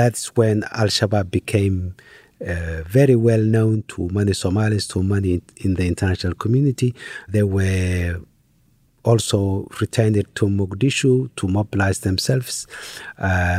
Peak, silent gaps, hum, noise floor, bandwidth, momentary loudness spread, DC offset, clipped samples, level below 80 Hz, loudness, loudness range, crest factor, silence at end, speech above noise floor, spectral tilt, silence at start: -4 dBFS; none; none; -58 dBFS; 15 kHz; 10 LU; under 0.1%; under 0.1%; -42 dBFS; -20 LUFS; 2 LU; 16 dB; 0 s; 39 dB; -6 dB/octave; 0 s